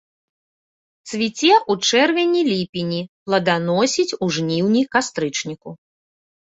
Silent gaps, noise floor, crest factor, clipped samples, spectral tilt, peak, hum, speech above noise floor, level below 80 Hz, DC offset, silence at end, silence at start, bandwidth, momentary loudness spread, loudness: 2.69-2.73 s, 3.09-3.26 s; under -90 dBFS; 18 dB; under 0.1%; -4 dB/octave; -2 dBFS; none; over 71 dB; -62 dBFS; under 0.1%; 0.7 s; 1.05 s; 8 kHz; 11 LU; -19 LUFS